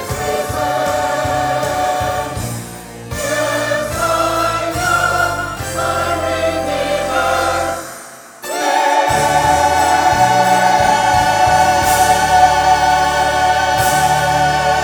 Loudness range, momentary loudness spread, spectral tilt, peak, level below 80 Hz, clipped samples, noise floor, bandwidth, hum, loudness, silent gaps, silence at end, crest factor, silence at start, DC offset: 6 LU; 10 LU; -3 dB/octave; 0 dBFS; -36 dBFS; under 0.1%; -35 dBFS; over 20 kHz; none; -14 LUFS; none; 0 s; 14 dB; 0 s; under 0.1%